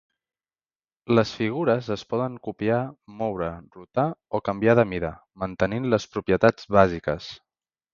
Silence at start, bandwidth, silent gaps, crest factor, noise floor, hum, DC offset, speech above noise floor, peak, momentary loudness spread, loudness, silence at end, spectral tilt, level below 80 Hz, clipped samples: 1.1 s; 7.4 kHz; none; 24 dB; under -90 dBFS; none; under 0.1%; over 66 dB; -2 dBFS; 13 LU; -24 LUFS; 0.6 s; -7 dB/octave; -50 dBFS; under 0.1%